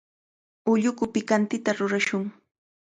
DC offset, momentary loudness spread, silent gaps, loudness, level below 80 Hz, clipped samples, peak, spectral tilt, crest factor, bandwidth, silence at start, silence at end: under 0.1%; 8 LU; none; -25 LUFS; -68 dBFS; under 0.1%; -10 dBFS; -5 dB/octave; 18 dB; 9.4 kHz; 0.65 s; 0.65 s